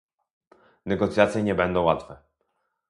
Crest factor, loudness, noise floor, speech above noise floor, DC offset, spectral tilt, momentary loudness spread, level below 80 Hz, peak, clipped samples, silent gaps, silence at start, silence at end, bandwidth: 24 dB; -24 LUFS; -75 dBFS; 52 dB; under 0.1%; -6.5 dB/octave; 9 LU; -50 dBFS; -2 dBFS; under 0.1%; none; 0.85 s; 0.75 s; 11.5 kHz